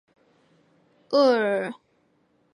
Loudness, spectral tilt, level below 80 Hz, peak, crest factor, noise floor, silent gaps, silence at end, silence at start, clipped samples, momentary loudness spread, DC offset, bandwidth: -23 LUFS; -5 dB/octave; -82 dBFS; -8 dBFS; 18 dB; -66 dBFS; none; 0.8 s; 1.1 s; under 0.1%; 16 LU; under 0.1%; 10.5 kHz